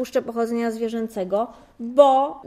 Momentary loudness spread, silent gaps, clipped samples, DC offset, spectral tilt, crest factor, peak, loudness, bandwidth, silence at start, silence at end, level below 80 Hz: 12 LU; none; under 0.1%; under 0.1%; -5.5 dB/octave; 20 dB; -2 dBFS; -21 LUFS; 14.5 kHz; 0 s; 0 s; -62 dBFS